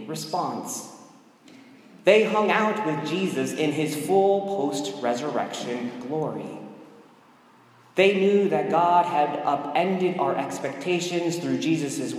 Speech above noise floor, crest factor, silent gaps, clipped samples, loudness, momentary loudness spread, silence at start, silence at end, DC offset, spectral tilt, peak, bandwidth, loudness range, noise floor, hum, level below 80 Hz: 31 dB; 20 dB; none; under 0.1%; -24 LUFS; 11 LU; 0 s; 0 s; under 0.1%; -5 dB/octave; -4 dBFS; 15.5 kHz; 5 LU; -54 dBFS; none; -78 dBFS